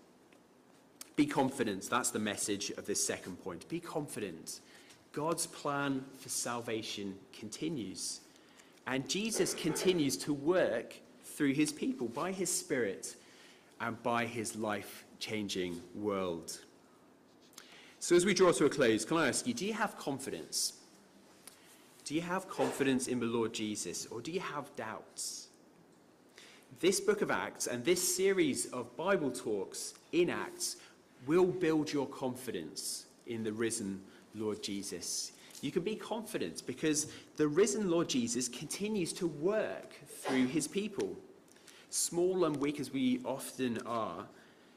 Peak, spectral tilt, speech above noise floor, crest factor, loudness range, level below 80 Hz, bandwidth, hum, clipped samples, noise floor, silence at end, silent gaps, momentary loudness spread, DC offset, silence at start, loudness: -20 dBFS; -3.5 dB/octave; 28 dB; 16 dB; 6 LU; -72 dBFS; 15.5 kHz; none; under 0.1%; -63 dBFS; 0.35 s; none; 14 LU; under 0.1%; 1.05 s; -35 LUFS